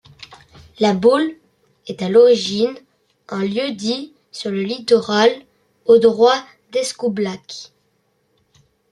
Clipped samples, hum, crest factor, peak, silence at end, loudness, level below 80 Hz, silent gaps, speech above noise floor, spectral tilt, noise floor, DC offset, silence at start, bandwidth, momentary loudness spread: under 0.1%; none; 16 dB; -2 dBFS; 1.25 s; -17 LUFS; -62 dBFS; none; 48 dB; -4.5 dB/octave; -65 dBFS; under 0.1%; 0.3 s; 11.5 kHz; 18 LU